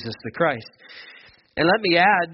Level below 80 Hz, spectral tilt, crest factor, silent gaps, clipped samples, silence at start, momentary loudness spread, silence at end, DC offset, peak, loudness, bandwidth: -58 dBFS; -2.5 dB/octave; 18 dB; none; under 0.1%; 0 s; 25 LU; 0 s; under 0.1%; -4 dBFS; -19 LUFS; 5.8 kHz